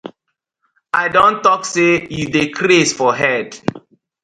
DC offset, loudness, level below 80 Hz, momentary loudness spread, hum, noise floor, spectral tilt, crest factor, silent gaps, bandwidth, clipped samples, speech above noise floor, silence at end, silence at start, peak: under 0.1%; -15 LUFS; -52 dBFS; 8 LU; none; -75 dBFS; -4 dB/octave; 16 dB; none; 10.5 kHz; under 0.1%; 60 dB; 0.45 s; 0.05 s; 0 dBFS